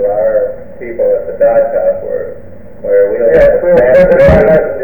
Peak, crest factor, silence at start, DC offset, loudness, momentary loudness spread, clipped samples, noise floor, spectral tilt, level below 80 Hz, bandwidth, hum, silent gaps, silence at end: 0 dBFS; 10 dB; 0 s; 4%; -9 LUFS; 14 LU; 0.2%; -32 dBFS; -8.5 dB/octave; -28 dBFS; over 20 kHz; none; none; 0 s